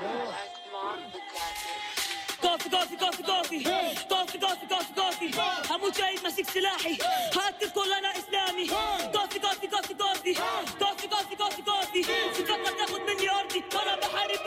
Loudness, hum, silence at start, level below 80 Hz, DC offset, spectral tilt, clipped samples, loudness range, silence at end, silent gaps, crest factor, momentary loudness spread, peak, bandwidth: -29 LUFS; none; 0 s; -64 dBFS; under 0.1%; -1 dB/octave; under 0.1%; 1 LU; 0 s; none; 14 dB; 7 LU; -16 dBFS; 16 kHz